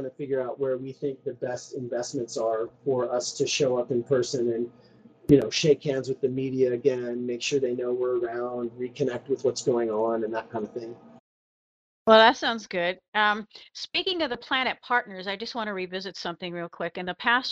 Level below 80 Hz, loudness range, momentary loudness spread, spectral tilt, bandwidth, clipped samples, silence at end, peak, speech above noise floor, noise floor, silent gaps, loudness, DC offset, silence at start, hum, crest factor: -62 dBFS; 6 LU; 12 LU; -4 dB/octave; 9 kHz; under 0.1%; 0 s; -2 dBFS; over 64 dB; under -90 dBFS; 11.20-12.06 s, 13.08-13.12 s; -26 LUFS; under 0.1%; 0 s; none; 24 dB